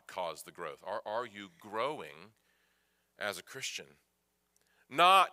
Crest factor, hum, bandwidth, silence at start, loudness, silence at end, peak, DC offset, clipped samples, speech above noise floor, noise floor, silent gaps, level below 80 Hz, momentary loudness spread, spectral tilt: 24 dB; none; 16 kHz; 0.1 s; -34 LUFS; 0.05 s; -12 dBFS; under 0.1%; under 0.1%; 44 dB; -77 dBFS; none; -84 dBFS; 19 LU; -2 dB/octave